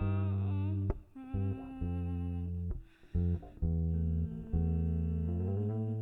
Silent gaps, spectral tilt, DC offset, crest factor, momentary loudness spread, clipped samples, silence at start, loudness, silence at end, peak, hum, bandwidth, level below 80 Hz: none; -11.5 dB/octave; under 0.1%; 14 dB; 7 LU; under 0.1%; 0 s; -36 LUFS; 0 s; -20 dBFS; none; 3.8 kHz; -42 dBFS